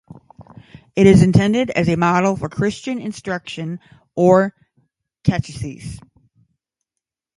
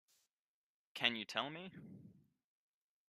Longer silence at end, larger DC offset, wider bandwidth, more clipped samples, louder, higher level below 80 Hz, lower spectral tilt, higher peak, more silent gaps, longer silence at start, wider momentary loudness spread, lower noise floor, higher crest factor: first, 1.4 s vs 0.95 s; neither; second, 11.5 kHz vs 15 kHz; neither; first, -17 LUFS vs -39 LUFS; first, -42 dBFS vs -88 dBFS; first, -7 dB/octave vs -3.5 dB/octave; first, 0 dBFS vs -16 dBFS; neither; second, 0.4 s vs 0.95 s; second, 18 LU vs 21 LU; second, -84 dBFS vs under -90 dBFS; second, 18 dB vs 30 dB